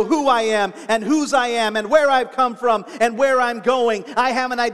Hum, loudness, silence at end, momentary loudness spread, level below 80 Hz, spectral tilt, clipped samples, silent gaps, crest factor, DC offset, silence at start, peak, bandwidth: none; -18 LUFS; 0 s; 4 LU; -60 dBFS; -3 dB/octave; under 0.1%; none; 16 dB; 0.4%; 0 s; -2 dBFS; 13.5 kHz